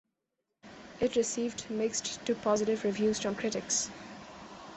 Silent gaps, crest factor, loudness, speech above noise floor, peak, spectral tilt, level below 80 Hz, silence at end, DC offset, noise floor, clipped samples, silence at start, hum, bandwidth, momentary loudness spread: none; 18 dB; -32 LUFS; 53 dB; -16 dBFS; -3 dB/octave; -64 dBFS; 0 s; under 0.1%; -84 dBFS; under 0.1%; 0.65 s; none; 8.6 kHz; 18 LU